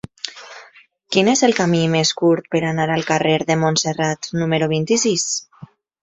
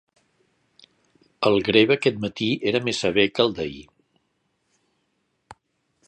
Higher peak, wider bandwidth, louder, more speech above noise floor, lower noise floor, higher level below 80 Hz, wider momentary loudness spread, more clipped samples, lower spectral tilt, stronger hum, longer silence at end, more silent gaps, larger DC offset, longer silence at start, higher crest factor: about the same, -2 dBFS vs -2 dBFS; second, 8.4 kHz vs 9.8 kHz; first, -18 LUFS vs -21 LUFS; second, 31 dB vs 51 dB; second, -49 dBFS vs -72 dBFS; about the same, -58 dBFS vs -58 dBFS; about the same, 10 LU vs 11 LU; neither; about the same, -4 dB/octave vs -5 dB/octave; neither; second, 0.35 s vs 2.25 s; neither; neither; second, 0.25 s vs 1.4 s; second, 18 dB vs 24 dB